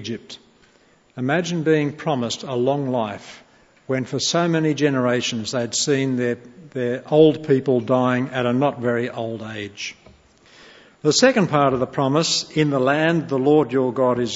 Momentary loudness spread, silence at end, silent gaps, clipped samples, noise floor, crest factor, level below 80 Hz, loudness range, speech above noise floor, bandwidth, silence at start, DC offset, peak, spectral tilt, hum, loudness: 14 LU; 0 s; none; under 0.1%; -56 dBFS; 20 dB; -62 dBFS; 5 LU; 36 dB; 8 kHz; 0 s; under 0.1%; -2 dBFS; -5 dB/octave; none; -20 LUFS